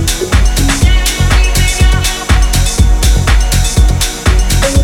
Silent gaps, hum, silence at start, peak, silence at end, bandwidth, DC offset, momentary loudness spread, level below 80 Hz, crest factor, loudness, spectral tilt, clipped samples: none; none; 0 s; 0 dBFS; 0 s; 17 kHz; under 0.1%; 2 LU; -10 dBFS; 8 dB; -11 LUFS; -4 dB/octave; 0.2%